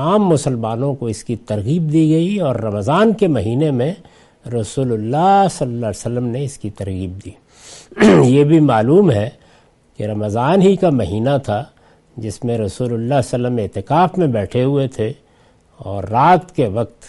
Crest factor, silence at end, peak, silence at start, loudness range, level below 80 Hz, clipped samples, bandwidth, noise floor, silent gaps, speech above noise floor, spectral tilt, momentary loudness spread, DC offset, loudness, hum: 16 dB; 0 s; 0 dBFS; 0 s; 5 LU; -48 dBFS; under 0.1%; 11.5 kHz; -52 dBFS; none; 36 dB; -7 dB/octave; 14 LU; under 0.1%; -16 LUFS; none